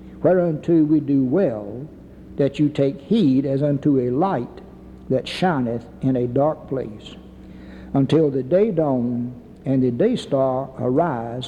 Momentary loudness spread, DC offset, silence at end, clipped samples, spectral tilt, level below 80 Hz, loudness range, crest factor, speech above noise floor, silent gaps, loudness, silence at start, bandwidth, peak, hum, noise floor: 16 LU; under 0.1%; 0 s; under 0.1%; -8.5 dB/octave; -50 dBFS; 3 LU; 14 dB; 20 dB; none; -20 LUFS; 0 s; 10.5 kHz; -6 dBFS; none; -40 dBFS